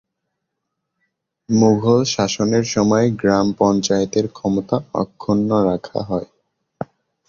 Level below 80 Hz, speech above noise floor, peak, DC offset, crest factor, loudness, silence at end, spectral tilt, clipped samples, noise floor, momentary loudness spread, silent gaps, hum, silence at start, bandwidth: -50 dBFS; 60 dB; -2 dBFS; under 0.1%; 16 dB; -18 LUFS; 0.45 s; -5.5 dB/octave; under 0.1%; -78 dBFS; 10 LU; none; none; 1.5 s; 7.4 kHz